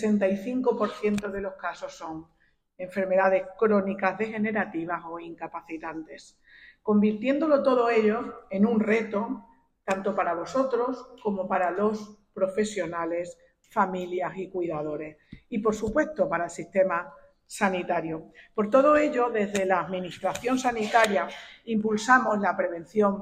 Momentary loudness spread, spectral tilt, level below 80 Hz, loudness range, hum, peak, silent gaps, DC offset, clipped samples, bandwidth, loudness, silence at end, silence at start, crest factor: 15 LU; -5.5 dB/octave; -60 dBFS; 5 LU; none; -4 dBFS; none; under 0.1%; under 0.1%; 15 kHz; -26 LUFS; 0 s; 0 s; 22 dB